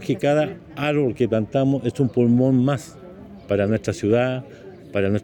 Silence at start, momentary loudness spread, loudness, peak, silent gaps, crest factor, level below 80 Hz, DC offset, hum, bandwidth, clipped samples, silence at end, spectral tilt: 0 s; 22 LU; -21 LUFS; -6 dBFS; none; 14 dB; -54 dBFS; under 0.1%; none; 16.5 kHz; under 0.1%; 0 s; -7.5 dB/octave